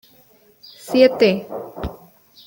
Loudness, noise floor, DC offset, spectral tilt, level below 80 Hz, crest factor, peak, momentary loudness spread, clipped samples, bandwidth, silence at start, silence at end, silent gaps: -17 LUFS; -53 dBFS; under 0.1%; -6 dB/octave; -46 dBFS; 20 dB; -2 dBFS; 19 LU; under 0.1%; 17 kHz; 0.85 s; 0.5 s; none